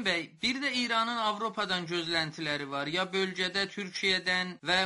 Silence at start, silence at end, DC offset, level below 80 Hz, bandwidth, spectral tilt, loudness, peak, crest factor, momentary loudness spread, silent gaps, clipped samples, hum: 0 s; 0 s; under 0.1%; -66 dBFS; 11.5 kHz; -3 dB/octave; -30 LUFS; -12 dBFS; 20 dB; 5 LU; none; under 0.1%; none